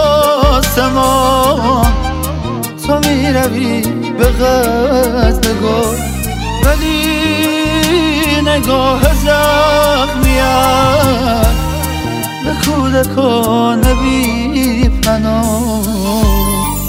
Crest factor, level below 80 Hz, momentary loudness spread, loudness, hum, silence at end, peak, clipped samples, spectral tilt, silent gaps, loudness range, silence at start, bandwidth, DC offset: 12 dB; -18 dBFS; 7 LU; -12 LUFS; none; 0 s; 0 dBFS; under 0.1%; -5 dB/octave; none; 2 LU; 0 s; 16.5 kHz; under 0.1%